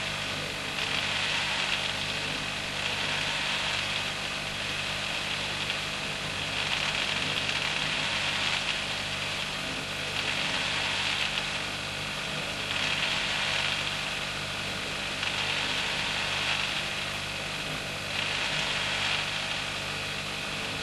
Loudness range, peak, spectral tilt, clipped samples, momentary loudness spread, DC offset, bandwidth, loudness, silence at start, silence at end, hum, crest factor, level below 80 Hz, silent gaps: 1 LU; -12 dBFS; -2 dB/octave; under 0.1%; 5 LU; under 0.1%; 16 kHz; -28 LUFS; 0 s; 0 s; 50 Hz at -55 dBFS; 18 dB; -52 dBFS; none